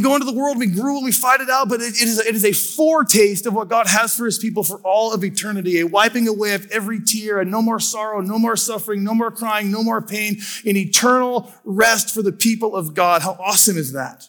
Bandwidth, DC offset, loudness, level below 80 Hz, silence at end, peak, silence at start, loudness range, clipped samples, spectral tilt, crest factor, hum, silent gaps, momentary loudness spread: 19.5 kHz; under 0.1%; -17 LUFS; -68 dBFS; 0.05 s; -2 dBFS; 0 s; 4 LU; under 0.1%; -3 dB/octave; 16 dB; none; none; 8 LU